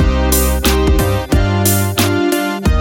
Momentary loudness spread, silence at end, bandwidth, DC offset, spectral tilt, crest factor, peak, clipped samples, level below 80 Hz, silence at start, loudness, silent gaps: 3 LU; 0 s; 19 kHz; under 0.1%; -5 dB/octave; 10 dB; -2 dBFS; under 0.1%; -18 dBFS; 0 s; -14 LUFS; none